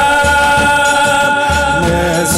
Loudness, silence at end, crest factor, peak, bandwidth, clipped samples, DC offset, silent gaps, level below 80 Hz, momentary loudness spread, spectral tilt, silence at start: -11 LUFS; 0 s; 10 dB; 0 dBFS; 16 kHz; under 0.1%; under 0.1%; none; -26 dBFS; 3 LU; -3.5 dB/octave; 0 s